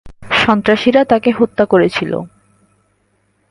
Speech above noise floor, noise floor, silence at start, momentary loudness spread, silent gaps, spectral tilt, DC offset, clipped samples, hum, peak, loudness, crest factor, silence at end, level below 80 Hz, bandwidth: 48 dB; -60 dBFS; 0.05 s; 10 LU; none; -6 dB/octave; under 0.1%; under 0.1%; none; 0 dBFS; -13 LUFS; 14 dB; 1.25 s; -46 dBFS; 11 kHz